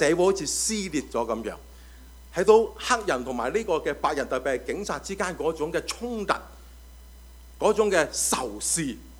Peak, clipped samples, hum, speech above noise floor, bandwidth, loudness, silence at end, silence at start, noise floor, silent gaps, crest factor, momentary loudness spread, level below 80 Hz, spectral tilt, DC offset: -6 dBFS; under 0.1%; none; 21 dB; over 20 kHz; -26 LUFS; 0 s; 0 s; -47 dBFS; none; 22 dB; 10 LU; -48 dBFS; -3 dB/octave; under 0.1%